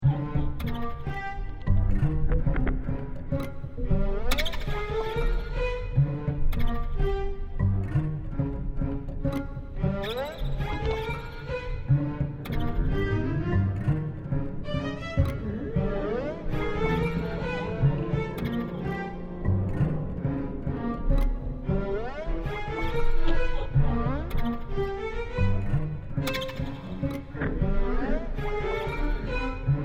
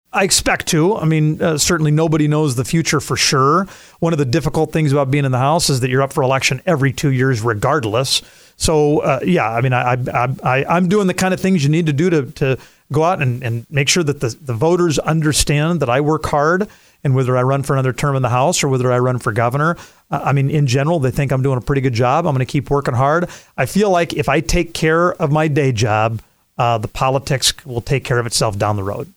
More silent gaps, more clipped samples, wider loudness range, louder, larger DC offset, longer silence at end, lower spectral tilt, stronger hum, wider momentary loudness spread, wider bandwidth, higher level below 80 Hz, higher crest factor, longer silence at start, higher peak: neither; neither; about the same, 2 LU vs 1 LU; second, -30 LUFS vs -16 LUFS; neither; about the same, 0 s vs 0.1 s; first, -7.5 dB/octave vs -5 dB/octave; neither; about the same, 7 LU vs 5 LU; second, 14.5 kHz vs 16.5 kHz; first, -30 dBFS vs -38 dBFS; about the same, 16 dB vs 14 dB; second, 0 s vs 0.15 s; second, -10 dBFS vs -2 dBFS